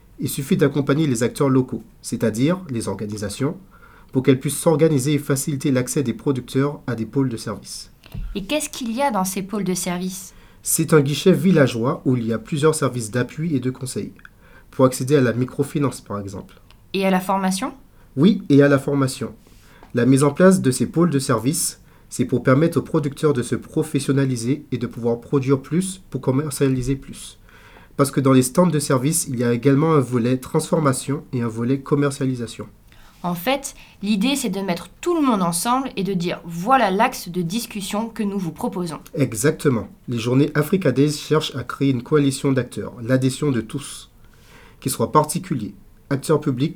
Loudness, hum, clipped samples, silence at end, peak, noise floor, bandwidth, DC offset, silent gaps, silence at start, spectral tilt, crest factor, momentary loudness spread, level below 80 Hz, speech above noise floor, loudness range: -20 LUFS; none; under 0.1%; 0 s; 0 dBFS; -47 dBFS; 19.5 kHz; under 0.1%; none; 0.2 s; -5.5 dB/octave; 20 dB; 13 LU; -48 dBFS; 27 dB; 5 LU